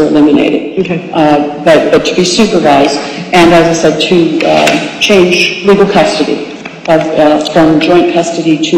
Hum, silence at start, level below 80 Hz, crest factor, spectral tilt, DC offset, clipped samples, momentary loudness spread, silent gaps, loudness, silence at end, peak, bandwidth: none; 0 s; -40 dBFS; 8 dB; -4.5 dB/octave; under 0.1%; 0.4%; 7 LU; none; -8 LUFS; 0 s; 0 dBFS; 15 kHz